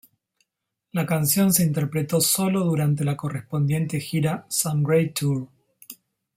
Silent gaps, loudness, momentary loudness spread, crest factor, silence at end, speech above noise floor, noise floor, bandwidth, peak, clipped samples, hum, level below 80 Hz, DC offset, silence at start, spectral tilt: none; -23 LUFS; 11 LU; 20 dB; 0.45 s; 59 dB; -81 dBFS; 16.5 kHz; -4 dBFS; under 0.1%; none; -60 dBFS; under 0.1%; 0.95 s; -5 dB/octave